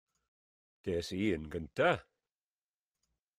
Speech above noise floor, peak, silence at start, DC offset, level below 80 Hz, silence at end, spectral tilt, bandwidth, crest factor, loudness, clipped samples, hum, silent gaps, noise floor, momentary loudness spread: over 56 dB; -16 dBFS; 0.85 s; under 0.1%; -62 dBFS; 1.35 s; -6 dB/octave; 14.5 kHz; 22 dB; -35 LUFS; under 0.1%; none; none; under -90 dBFS; 9 LU